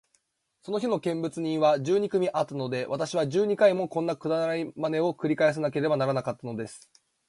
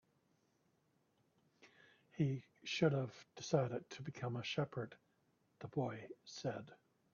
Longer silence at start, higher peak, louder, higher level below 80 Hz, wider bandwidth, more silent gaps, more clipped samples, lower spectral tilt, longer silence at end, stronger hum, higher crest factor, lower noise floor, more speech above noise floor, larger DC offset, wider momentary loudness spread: second, 0.65 s vs 1.65 s; first, -10 dBFS vs -22 dBFS; first, -27 LUFS vs -42 LUFS; first, -72 dBFS vs -80 dBFS; first, 11.5 kHz vs 7 kHz; neither; neither; about the same, -6 dB/octave vs -5.5 dB/octave; about the same, 0.5 s vs 0.4 s; neither; about the same, 18 dB vs 22 dB; second, -72 dBFS vs -79 dBFS; first, 46 dB vs 38 dB; neither; second, 10 LU vs 15 LU